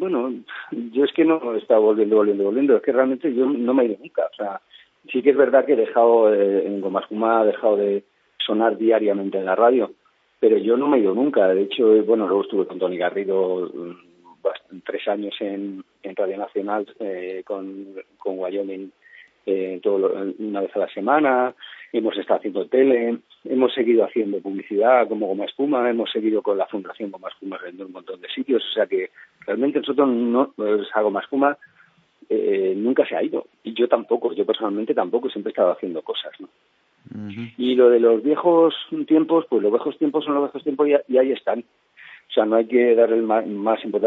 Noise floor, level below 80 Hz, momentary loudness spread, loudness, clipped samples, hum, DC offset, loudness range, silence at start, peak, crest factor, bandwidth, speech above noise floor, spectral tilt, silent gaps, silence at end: -54 dBFS; -80 dBFS; 14 LU; -21 LUFS; under 0.1%; none; under 0.1%; 8 LU; 0 s; -4 dBFS; 18 dB; 4.1 kHz; 34 dB; -8.5 dB/octave; none; 0 s